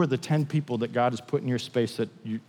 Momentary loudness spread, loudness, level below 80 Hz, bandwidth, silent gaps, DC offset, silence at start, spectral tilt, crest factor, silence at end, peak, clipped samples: 4 LU; -28 LUFS; -80 dBFS; 13 kHz; none; under 0.1%; 0 s; -7 dB/octave; 16 dB; 0.1 s; -12 dBFS; under 0.1%